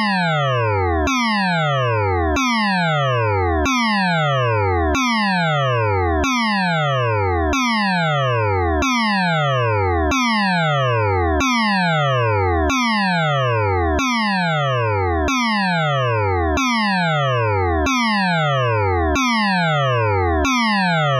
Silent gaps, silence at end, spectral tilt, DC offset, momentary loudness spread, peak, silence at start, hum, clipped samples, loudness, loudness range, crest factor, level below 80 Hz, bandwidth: none; 0 s; -5.5 dB/octave; under 0.1%; 2 LU; -10 dBFS; 0 s; none; under 0.1%; -18 LUFS; 1 LU; 8 dB; -32 dBFS; 13.5 kHz